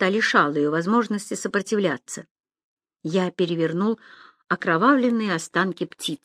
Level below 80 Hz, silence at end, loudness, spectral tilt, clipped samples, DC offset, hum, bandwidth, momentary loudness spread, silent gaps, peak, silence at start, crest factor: -74 dBFS; 0.1 s; -23 LUFS; -5 dB/octave; under 0.1%; under 0.1%; none; 14.5 kHz; 10 LU; 2.31-2.35 s, 2.64-2.77 s; -4 dBFS; 0 s; 20 dB